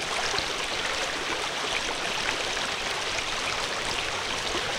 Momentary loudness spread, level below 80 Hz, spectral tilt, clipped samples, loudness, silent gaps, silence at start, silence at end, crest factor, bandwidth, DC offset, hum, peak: 1 LU; -48 dBFS; -1 dB/octave; under 0.1%; -27 LUFS; none; 0 s; 0 s; 20 dB; 18 kHz; under 0.1%; none; -10 dBFS